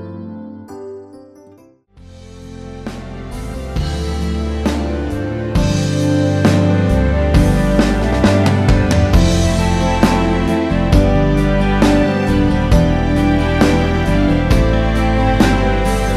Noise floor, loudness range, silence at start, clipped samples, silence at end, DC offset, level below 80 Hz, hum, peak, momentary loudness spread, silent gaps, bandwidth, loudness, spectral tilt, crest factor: -46 dBFS; 12 LU; 0 s; under 0.1%; 0 s; under 0.1%; -20 dBFS; none; 0 dBFS; 16 LU; none; 13.5 kHz; -15 LUFS; -6.5 dB/octave; 14 dB